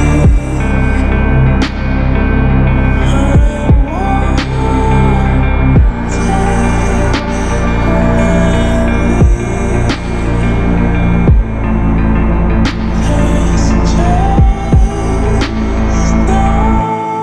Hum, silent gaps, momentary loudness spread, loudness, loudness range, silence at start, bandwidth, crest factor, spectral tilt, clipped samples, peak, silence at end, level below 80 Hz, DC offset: none; none; 4 LU; -12 LUFS; 1 LU; 0 s; 9.6 kHz; 10 dB; -7 dB/octave; under 0.1%; 0 dBFS; 0 s; -12 dBFS; under 0.1%